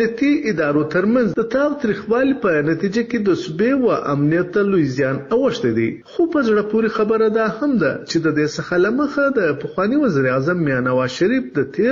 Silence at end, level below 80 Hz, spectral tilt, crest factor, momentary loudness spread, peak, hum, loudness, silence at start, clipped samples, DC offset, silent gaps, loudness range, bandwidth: 0 s; -52 dBFS; -7 dB/octave; 10 dB; 3 LU; -6 dBFS; none; -18 LUFS; 0 s; under 0.1%; under 0.1%; none; 0 LU; 7.6 kHz